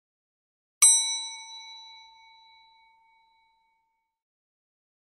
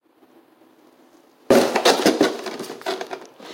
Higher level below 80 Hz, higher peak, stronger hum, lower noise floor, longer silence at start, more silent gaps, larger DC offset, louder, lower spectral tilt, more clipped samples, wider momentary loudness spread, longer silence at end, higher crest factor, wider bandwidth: second, -86 dBFS vs -62 dBFS; about the same, -4 dBFS vs -2 dBFS; neither; first, -77 dBFS vs -54 dBFS; second, 0.8 s vs 1.5 s; neither; neither; about the same, -20 LUFS vs -20 LUFS; second, 7.5 dB/octave vs -3 dB/octave; neither; first, 26 LU vs 16 LU; first, 3.35 s vs 0 s; first, 26 dB vs 20 dB; second, 13.5 kHz vs 17 kHz